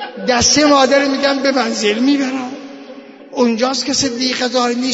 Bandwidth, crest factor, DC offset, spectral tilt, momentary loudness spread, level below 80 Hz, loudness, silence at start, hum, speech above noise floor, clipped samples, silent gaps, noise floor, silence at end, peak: 8 kHz; 14 dB; under 0.1%; -2.5 dB/octave; 16 LU; -48 dBFS; -14 LUFS; 0 s; none; 22 dB; under 0.1%; none; -36 dBFS; 0 s; -2 dBFS